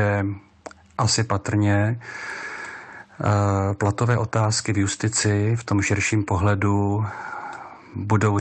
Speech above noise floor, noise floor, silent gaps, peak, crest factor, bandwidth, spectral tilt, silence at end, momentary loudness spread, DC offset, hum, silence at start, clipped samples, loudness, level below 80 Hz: 23 dB; -44 dBFS; none; -8 dBFS; 14 dB; 9.2 kHz; -5 dB/octave; 0 s; 15 LU; under 0.1%; none; 0 s; under 0.1%; -22 LUFS; -56 dBFS